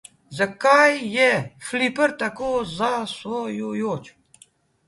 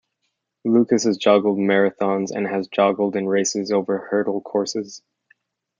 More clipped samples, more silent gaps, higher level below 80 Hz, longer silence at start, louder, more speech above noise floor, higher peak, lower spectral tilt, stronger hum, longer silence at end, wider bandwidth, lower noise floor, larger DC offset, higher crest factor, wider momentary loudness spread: neither; neither; first, -60 dBFS vs -70 dBFS; second, 0.3 s vs 0.65 s; about the same, -21 LUFS vs -20 LUFS; second, 35 dB vs 56 dB; about the same, -2 dBFS vs -2 dBFS; about the same, -4 dB/octave vs -4.5 dB/octave; neither; about the same, 0.8 s vs 0.8 s; first, 11.5 kHz vs 9.4 kHz; second, -56 dBFS vs -75 dBFS; neither; about the same, 20 dB vs 18 dB; first, 13 LU vs 7 LU